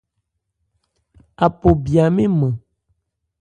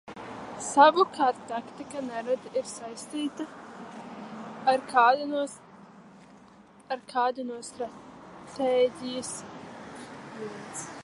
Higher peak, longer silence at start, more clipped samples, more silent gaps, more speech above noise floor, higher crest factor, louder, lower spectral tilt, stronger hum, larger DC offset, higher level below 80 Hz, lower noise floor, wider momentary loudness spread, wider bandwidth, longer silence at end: first, 0 dBFS vs -4 dBFS; first, 1.4 s vs 0.05 s; neither; neither; first, 59 dB vs 27 dB; about the same, 20 dB vs 24 dB; first, -17 LUFS vs -28 LUFS; first, -9 dB/octave vs -3 dB/octave; neither; neither; first, -36 dBFS vs -72 dBFS; first, -74 dBFS vs -54 dBFS; second, 6 LU vs 21 LU; second, 9.6 kHz vs 11.5 kHz; first, 0.85 s vs 0 s